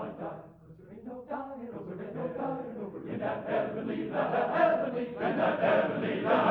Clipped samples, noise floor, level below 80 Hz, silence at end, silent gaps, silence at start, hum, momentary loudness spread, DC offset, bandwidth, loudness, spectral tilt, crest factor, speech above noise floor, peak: under 0.1%; -52 dBFS; -68 dBFS; 0 s; none; 0 s; none; 15 LU; under 0.1%; 5.4 kHz; -31 LUFS; -8.5 dB/octave; 18 dB; 25 dB; -12 dBFS